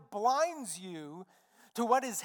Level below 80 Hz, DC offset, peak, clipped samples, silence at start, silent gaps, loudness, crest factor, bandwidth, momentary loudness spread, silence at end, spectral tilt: under -90 dBFS; under 0.1%; -14 dBFS; under 0.1%; 0 s; none; -32 LUFS; 20 dB; 19 kHz; 17 LU; 0 s; -3 dB/octave